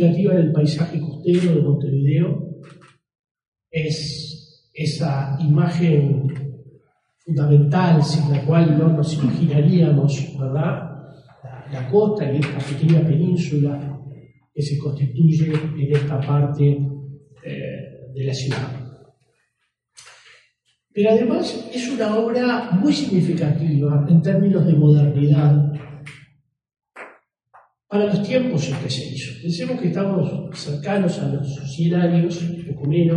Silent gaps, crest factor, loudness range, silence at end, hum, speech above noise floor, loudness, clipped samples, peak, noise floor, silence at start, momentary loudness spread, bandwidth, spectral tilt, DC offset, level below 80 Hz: 3.19-3.24 s, 3.31-3.35 s, 3.48-3.52 s; 16 dB; 8 LU; 0 s; none; 55 dB; -19 LUFS; under 0.1%; -4 dBFS; -73 dBFS; 0 s; 16 LU; 9.8 kHz; -8 dB/octave; under 0.1%; -58 dBFS